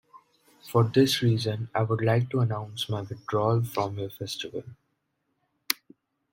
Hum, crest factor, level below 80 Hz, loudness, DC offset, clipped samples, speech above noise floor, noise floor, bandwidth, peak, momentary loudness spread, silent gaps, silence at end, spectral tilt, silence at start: none; 26 dB; -66 dBFS; -27 LUFS; under 0.1%; under 0.1%; 51 dB; -77 dBFS; 16.5 kHz; -2 dBFS; 12 LU; none; 0.6 s; -6 dB/octave; 0.15 s